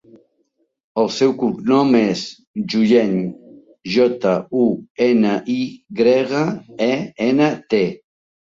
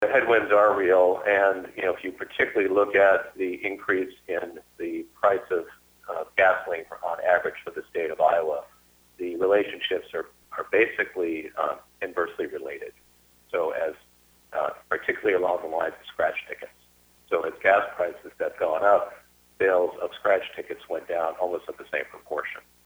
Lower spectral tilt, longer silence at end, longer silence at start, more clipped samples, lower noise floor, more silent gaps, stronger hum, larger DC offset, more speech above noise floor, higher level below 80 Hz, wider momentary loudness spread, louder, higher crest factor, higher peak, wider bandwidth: first, -6.5 dB/octave vs -5 dB/octave; first, 0.5 s vs 0.25 s; first, 0.95 s vs 0 s; neither; first, -67 dBFS vs -57 dBFS; first, 2.47-2.54 s, 4.90-4.95 s vs none; neither; neither; first, 50 dB vs 32 dB; first, -60 dBFS vs -66 dBFS; second, 9 LU vs 15 LU; first, -18 LUFS vs -25 LUFS; about the same, 16 dB vs 20 dB; first, -2 dBFS vs -6 dBFS; second, 7.6 kHz vs over 20 kHz